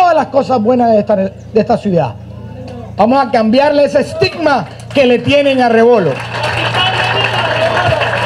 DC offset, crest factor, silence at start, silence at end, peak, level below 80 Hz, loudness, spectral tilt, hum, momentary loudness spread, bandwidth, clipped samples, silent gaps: under 0.1%; 12 dB; 0 s; 0 s; 0 dBFS; -46 dBFS; -12 LUFS; -6 dB/octave; none; 8 LU; 12 kHz; under 0.1%; none